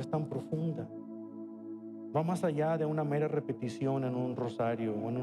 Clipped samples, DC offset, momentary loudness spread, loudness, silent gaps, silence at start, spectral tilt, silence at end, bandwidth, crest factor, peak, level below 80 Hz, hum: under 0.1%; under 0.1%; 13 LU; -34 LUFS; none; 0 s; -8.5 dB/octave; 0 s; 12.5 kHz; 16 dB; -18 dBFS; -76 dBFS; none